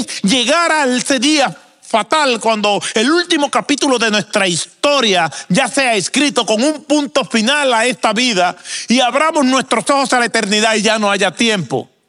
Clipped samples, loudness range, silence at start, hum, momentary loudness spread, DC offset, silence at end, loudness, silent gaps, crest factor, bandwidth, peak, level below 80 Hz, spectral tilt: under 0.1%; 1 LU; 0 s; none; 4 LU; under 0.1%; 0.25 s; -13 LUFS; none; 14 dB; 14.5 kHz; 0 dBFS; -64 dBFS; -3 dB/octave